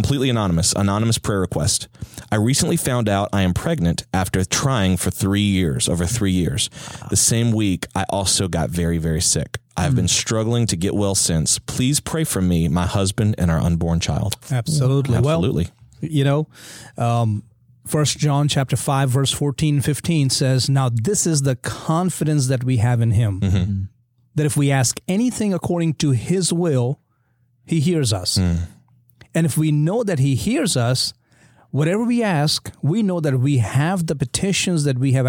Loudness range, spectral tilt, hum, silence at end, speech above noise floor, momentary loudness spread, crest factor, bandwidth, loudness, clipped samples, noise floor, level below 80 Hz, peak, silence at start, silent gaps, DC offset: 2 LU; -5 dB/octave; none; 0 s; 44 dB; 6 LU; 16 dB; 17 kHz; -19 LUFS; under 0.1%; -62 dBFS; -40 dBFS; -4 dBFS; 0 s; none; under 0.1%